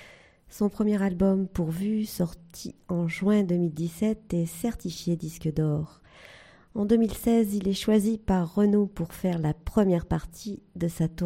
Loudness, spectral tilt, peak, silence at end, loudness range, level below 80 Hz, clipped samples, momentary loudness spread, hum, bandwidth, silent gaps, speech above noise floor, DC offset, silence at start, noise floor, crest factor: -27 LUFS; -7 dB/octave; -8 dBFS; 0 s; 4 LU; -46 dBFS; under 0.1%; 9 LU; none; 16 kHz; none; 27 dB; under 0.1%; 0 s; -53 dBFS; 18 dB